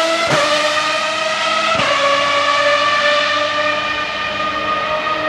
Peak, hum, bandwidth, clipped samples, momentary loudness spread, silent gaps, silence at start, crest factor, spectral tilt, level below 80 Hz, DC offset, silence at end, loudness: -2 dBFS; none; 13.5 kHz; under 0.1%; 5 LU; none; 0 s; 14 dB; -2 dB/octave; -50 dBFS; under 0.1%; 0 s; -15 LUFS